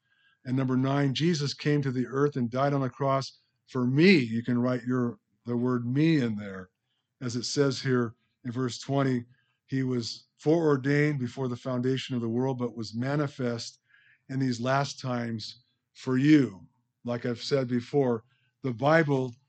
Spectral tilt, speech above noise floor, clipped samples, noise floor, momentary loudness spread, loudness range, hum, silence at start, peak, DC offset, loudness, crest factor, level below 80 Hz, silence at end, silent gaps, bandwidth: -6.5 dB/octave; 33 dB; under 0.1%; -60 dBFS; 13 LU; 5 LU; none; 0.45 s; -8 dBFS; under 0.1%; -28 LUFS; 20 dB; -74 dBFS; 0.15 s; none; 8.8 kHz